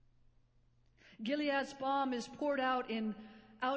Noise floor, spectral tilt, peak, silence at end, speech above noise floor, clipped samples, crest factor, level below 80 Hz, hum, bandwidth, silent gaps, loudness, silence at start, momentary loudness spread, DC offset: -70 dBFS; -4.5 dB/octave; -22 dBFS; 0 s; 33 dB; under 0.1%; 16 dB; -74 dBFS; none; 8 kHz; none; -37 LUFS; 1.1 s; 9 LU; under 0.1%